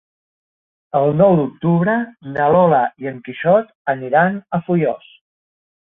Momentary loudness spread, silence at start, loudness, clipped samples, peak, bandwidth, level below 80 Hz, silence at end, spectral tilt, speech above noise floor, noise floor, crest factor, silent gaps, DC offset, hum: 10 LU; 0.95 s; -17 LUFS; under 0.1%; -2 dBFS; 3.9 kHz; -58 dBFS; 1 s; -11.5 dB/octave; over 74 dB; under -90 dBFS; 16 dB; 3.75-3.85 s; under 0.1%; none